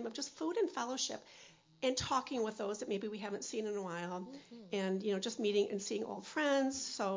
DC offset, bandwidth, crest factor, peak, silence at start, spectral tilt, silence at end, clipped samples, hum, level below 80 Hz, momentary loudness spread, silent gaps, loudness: under 0.1%; 7.6 kHz; 16 dB; -22 dBFS; 0 s; -3.5 dB/octave; 0 s; under 0.1%; none; -70 dBFS; 9 LU; none; -38 LUFS